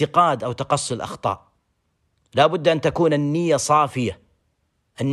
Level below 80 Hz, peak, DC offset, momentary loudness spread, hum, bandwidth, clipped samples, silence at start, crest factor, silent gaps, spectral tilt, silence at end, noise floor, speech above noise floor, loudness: -56 dBFS; -4 dBFS; under 0.1%; 10 LU; none; 12.5 kHz; under 0.1%; 0 s; 18 dB; none; -5 dB/octave; 0 s; -69 dBFS; 50 dB; -21 LUFS